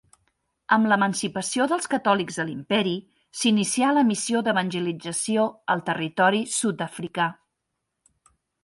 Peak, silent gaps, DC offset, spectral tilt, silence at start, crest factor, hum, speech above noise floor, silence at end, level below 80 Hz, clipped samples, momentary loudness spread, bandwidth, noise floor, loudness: -6 dBFS; none; under 0.1%; -4 dB/octave; 0.7 s; 18 dB; none; 57 dB; 1.3 s; -68 dBFS; under 0.1%; 8 LU; 11.5 kHz; -80 dBFS; -24 LUFS